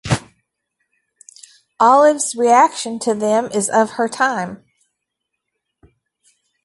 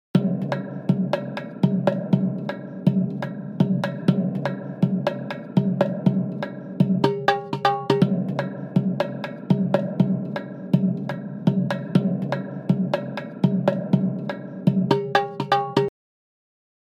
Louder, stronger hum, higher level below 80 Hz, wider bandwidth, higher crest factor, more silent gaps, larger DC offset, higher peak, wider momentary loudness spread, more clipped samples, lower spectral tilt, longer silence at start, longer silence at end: first, -16 LUFS vs -24 LUFS; neither; first, -50 dBFS vs -68 dBFS; first, 11.5 kHz vs 7.4 kHz; about the same, 18 dB vs 22 dB; neither; neither; about the same, -2 dBFS vs -2 dBFS; first, 11 LU vs 8 LU; neither; second, -4 dB/octave vs -8.5 dB/octave; about the same, 0.05 s vs 0.15 s; first, 2.1 s vs 1 s